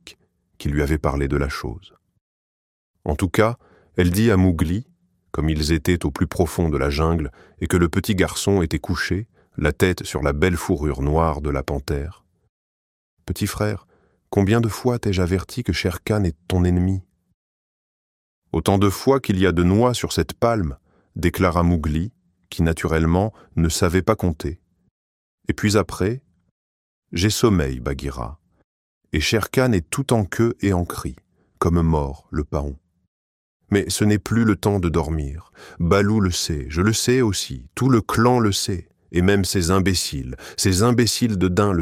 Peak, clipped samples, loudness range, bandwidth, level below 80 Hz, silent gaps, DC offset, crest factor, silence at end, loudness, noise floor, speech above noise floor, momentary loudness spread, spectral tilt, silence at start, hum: -2 dBFS; under 0.1%; 5 LU; 16.5 kHz; -34 dBFS; 2.21-2.94 s, 12.49-13.17 s, 17.34-18.42 s, 24.91-25.38 s, 26.51-27.02 s, 28.64-29.01 s, 33.08-33.60 s; under 0.1%; 18 dB; 0 s; -21 LUFS; -55 dBFS; 35 dB; 11 LU; -5.5 dB/octave; 0.05 s; none